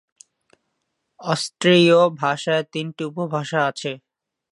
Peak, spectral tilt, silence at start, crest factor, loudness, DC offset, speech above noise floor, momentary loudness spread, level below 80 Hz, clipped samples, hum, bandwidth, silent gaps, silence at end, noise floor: -2 dBFS; -5 dB/octave; 1.2 s; 18 dB; -20 LUFS; under 0.1%; 56 dB; 16 LU; -72 dBFS; under 0.1%; none; 11.5 kHz; none; 0.55 s; -75 dBFS